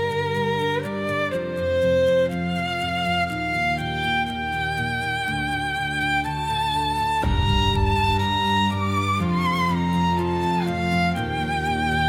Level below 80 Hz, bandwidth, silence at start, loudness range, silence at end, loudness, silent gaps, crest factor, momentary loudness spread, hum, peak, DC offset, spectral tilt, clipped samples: -36 dBFS; 16.5 kHz; 0 s; 2 LU; 0 s; -23 LUFS; none; 14 dB; 4 LU; none; -8 dBFS; under 0.1%; -5.5 dB/octave; under 0.1%